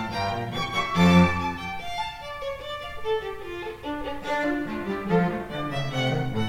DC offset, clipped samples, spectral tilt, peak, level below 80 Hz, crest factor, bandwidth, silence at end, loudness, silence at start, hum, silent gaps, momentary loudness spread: under 0.1%; under 0.1%; -6.5 dB/octave; -6 dBFS; -46 dBFS; 20 dB; 15.5 kHz; 0 s; -26 LUFS; 0 s; none; none; 14 LU